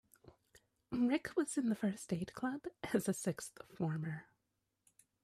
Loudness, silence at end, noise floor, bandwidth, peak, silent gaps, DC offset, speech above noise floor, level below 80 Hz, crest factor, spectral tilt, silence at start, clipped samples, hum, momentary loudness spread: -39 LUFS; 1 s; -86 dBFS; 15.5 kHz; -20 dBFS; none; under 0.1%; 47 dB; -72 dBFS; 20 dB; -5.5 dB/octave; 0.25 s; under 0.1%; none; 10 LU